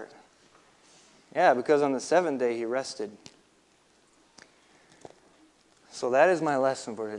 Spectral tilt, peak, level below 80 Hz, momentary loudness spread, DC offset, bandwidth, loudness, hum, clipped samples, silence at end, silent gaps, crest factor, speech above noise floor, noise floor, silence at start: -4.5 dB/octave; -8 dBFS; -80 dBFS; 15 LU; under 0.1%; 11 kHz; -26 LUFS; none; under 0.1%; 0 s; none; 22 dB; 38 dB; -64 dBFS; 0 s